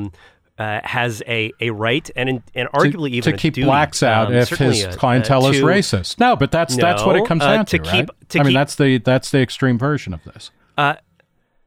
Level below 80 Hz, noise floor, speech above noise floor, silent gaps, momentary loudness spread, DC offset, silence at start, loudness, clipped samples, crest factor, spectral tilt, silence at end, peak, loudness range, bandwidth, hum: -44 dBFS; -60 dBFS; 43 dB; none; 7 LU; under 0.1%; 0 s; -17 LUFS; under 0.1%; 14 dB; -5.5 dB/octave; 0.7 s; -2 dBFS; 3 LU; 15.5 kHz; none